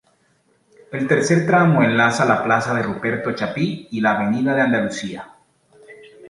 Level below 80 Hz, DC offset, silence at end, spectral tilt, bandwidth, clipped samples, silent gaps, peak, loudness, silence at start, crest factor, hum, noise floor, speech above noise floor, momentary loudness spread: -58 dBFS; under 0.1%; 0 s; -6 dB/octave; 11.5 kHz; under 0.1%; none; -2 dBFS; -18 LUFS; 0.9 s; 18 dB; none; -61 dBFS; 43 dB; 11 LU